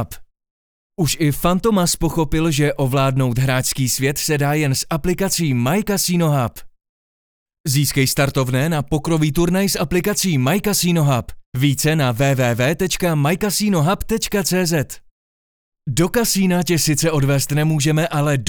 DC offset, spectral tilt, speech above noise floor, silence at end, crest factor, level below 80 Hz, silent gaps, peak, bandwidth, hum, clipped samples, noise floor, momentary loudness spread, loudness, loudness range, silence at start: under 0.1%; -5 dB/octave; over 73 dB; 0 s; 16 dB; -38 dBFS; 0.50-0.90 s, 6.89-7.46 s, 7.60-7.64 s, 11.46-11.52 s, 15.11-15.72 s; -2 dBFS; over 20 kHz; none; under 0.1%; under -90 dBFS; 4 LU; -18 LUFS; 2 LU; 0 s